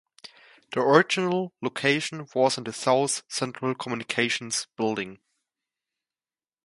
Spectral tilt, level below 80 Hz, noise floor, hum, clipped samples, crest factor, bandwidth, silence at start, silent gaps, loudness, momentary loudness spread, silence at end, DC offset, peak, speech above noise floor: -3.5 dB/octave; -72 dBFS; under -90 dBFS; none; under 0.1%; 26 dB; 11.5 kHz; 0.25 s; none; -25 LUFS; 11 LU; 1.5 s; under 0.1%; -2 dBFS; over 64 dB